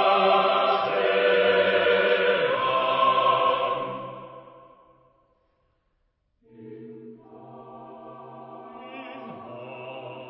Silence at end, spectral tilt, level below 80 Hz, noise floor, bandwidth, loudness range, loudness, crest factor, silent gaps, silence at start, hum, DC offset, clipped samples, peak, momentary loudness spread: 0 s; -8 dB/octave; -70 dBFS; -72 dBFS; 5.8 kHz; 24 LU; -22 LUFS; 18 dB; none; 0 s; none; under 0.1%; under 0.1%; -8 dBFS; 23 LU